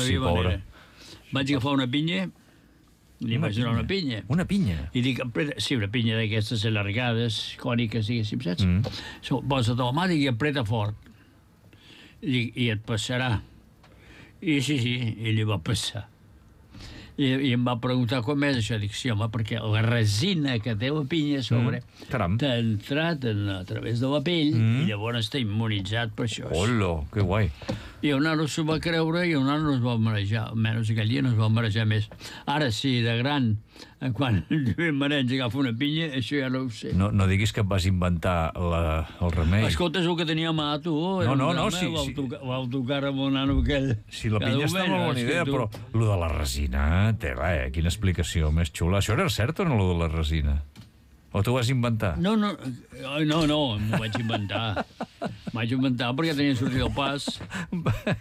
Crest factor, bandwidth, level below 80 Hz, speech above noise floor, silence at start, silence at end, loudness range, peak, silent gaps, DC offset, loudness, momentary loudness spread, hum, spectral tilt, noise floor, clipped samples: 12 dB; 14.5 kHz; -40 dBFS; 32 dB; 0 s; 0 s; 3 LU; -14 dBFS; none; under 0.1%; -26 LUFS; 7 LU; none; -6 dB/octave; -57 dBFS; under 0.1%